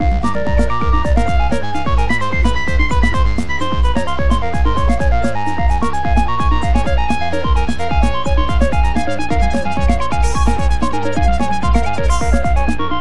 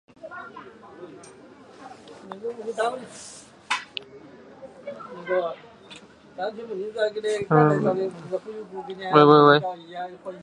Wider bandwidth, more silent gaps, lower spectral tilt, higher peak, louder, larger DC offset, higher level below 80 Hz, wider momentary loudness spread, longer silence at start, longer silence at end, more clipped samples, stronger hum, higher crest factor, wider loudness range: about the same, 11.5 kHz vs 11 kHz; neither; about the same, -6 dB/octave vs -6 dB/octave; about the same, 0 dBFS vs -2 dBFS; first, -17 LUFS vs -22 LUFS; first, 10% vs under 0.1%; first, -18 dBFS vs -68 dBFS; second, 3 LU vs 27 LU; second, 0 s vs 0.25 s; about the same, 0 s vs 0 s; neither; neither; second, 14 dB vs 24 dB; second, 0 LU vs 14 LU